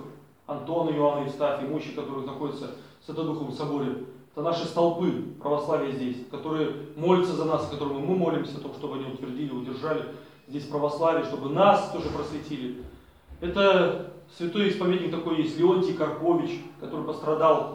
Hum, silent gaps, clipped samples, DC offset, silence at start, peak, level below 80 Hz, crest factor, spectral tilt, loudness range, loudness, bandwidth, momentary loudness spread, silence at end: none; none; under 0.1%; under 0.1%; 0 s; -6 dBFS; -58 dBFS; 22 dB; -7 dB/octave; 5 LU; -27 LUFS; 11 kHz; 14 LU; 0 s